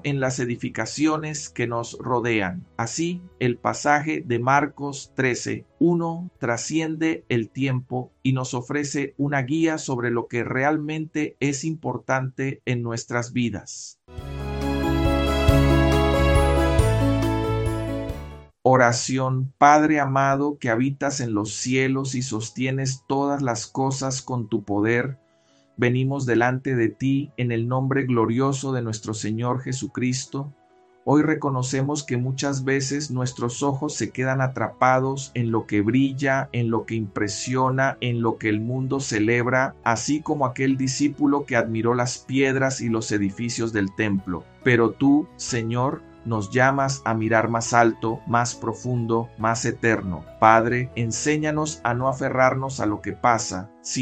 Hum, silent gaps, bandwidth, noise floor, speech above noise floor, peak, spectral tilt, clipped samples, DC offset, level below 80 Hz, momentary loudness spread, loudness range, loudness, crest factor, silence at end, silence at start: none; none; 14 kHz; -60 dBFS; 37 dB; 0 dBFS; -5.5 dB/octave; under 0.1%; under 0.1%; -36 dBFS; 9 LU; 5 LU; -23 LUFS; 22 dB; 0 s; 0.05 s